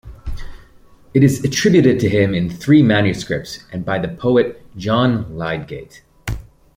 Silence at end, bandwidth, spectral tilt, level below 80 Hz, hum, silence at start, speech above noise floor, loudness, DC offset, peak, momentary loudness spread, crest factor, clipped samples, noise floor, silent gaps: 0.35 s; 16.5 kHz; -6 dB/octave; -38 dBFS; none; 0.05 s; 30 dB; -16 LUFS; under 0.1%; -2 dBFS; 19 LU; 16 dB; under 0.1%; -46 dBFS; none